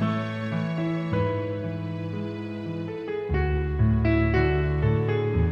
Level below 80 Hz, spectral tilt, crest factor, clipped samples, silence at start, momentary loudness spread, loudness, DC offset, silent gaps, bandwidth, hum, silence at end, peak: -34 dBFS; -9.5 dB/octave; 14 dB; under 0.1%; 0 s; 10 LU; -26 LUFS; under 0.1%; none; 6 kHz; none; 0 s; -10 dBFS